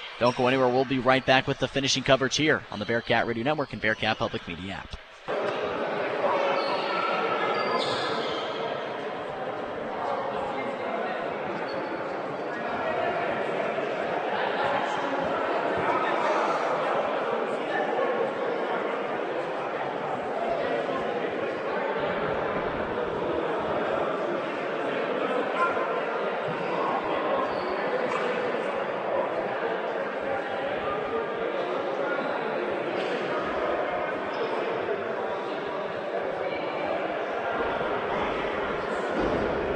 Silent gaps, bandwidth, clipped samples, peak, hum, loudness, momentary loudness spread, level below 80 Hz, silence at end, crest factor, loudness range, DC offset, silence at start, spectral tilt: none; 9.4 kHz; under 0.1%; -4 dBFS; none; -28 LUFS; 6 LU; -56 dBFS; 0 s; 24 dB; 4 LU; under 0.1%; 0 s; -4.5 dB/octave